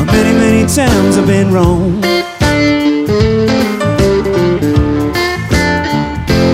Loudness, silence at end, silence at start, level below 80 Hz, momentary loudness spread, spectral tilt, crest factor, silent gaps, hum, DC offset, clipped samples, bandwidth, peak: -11 LUFS; 0 s; 0 s; -24 dBFS; 4 LU; -5.5 dB/octave; 10 dB; none; none; under 0.1%; under 0.1%; 16.5 kHz; 0 dBFS